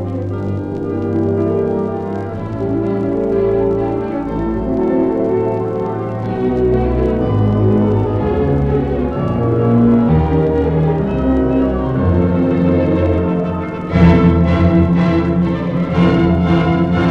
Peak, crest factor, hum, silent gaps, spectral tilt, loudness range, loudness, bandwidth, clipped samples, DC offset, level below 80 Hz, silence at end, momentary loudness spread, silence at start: 0 dBFS; 14 dB; none; none; -10 dB/octave; 4 LU; -15 LUFS; 6 kHz; under 0.1%; under 0.1%; -28 dBFS; 0 s; 8 LU; 0 s